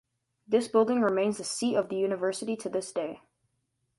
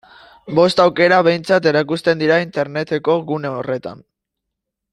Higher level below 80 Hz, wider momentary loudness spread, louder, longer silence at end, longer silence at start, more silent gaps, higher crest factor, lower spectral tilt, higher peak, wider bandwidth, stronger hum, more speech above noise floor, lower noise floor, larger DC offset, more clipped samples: second, -74 dBFS vs -60 dBFS; about the same, 10 LU vs 10 LU; second, -29 LUFS vs -16 LUFS; second, 0.8 s vs 0.95 s; about the same, 0.5 s vs 0.45 s; neither; about the same, 18 dB vs 16 dB; second, -4.5 dB/octave vs -6 dB/octave; second, -12 dBFS vs -2 dBFS; about the same, 11.5 kHz vs 11.5 kHz; neither; second, 50 dB vs 64 dB; about the same, -78 dBFS vs -80 dBFS; neither; neither